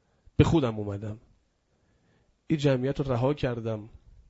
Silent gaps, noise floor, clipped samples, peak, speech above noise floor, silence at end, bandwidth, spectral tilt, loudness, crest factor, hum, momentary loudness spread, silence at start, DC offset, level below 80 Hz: none; -70 dBFS; under 0.1%; -4 dBFS; 43 dB; 0.4 s; 8 kHz; -7.5 dB/octave; -28 LUFS; 24 dB; none; 14 LU; 0.4 s; under 0.1%; -46 dBFS